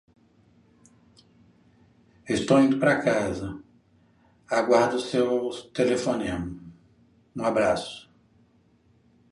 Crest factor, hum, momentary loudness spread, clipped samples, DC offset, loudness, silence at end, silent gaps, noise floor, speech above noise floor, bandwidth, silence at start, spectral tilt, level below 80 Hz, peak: 22 dB; none; 17 LU; under 0.1%; under 0.1%; -24 LUFS; 1.3 s; none; -62 dBFS; 38 dB; 11.5 kHz; 2.25 s; -5.5 dB/octave; -56 dBFS; -6 dBFS